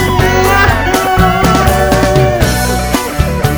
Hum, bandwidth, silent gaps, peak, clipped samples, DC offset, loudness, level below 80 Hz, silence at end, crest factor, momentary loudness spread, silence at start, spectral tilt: none; over 20 kHz; none; 0 dBFS; 0.4%; 0.5%; -10 LUFS; -18 dBFS; 0 s; 10 dB; 5 LU; 0 s; -5 dB/octave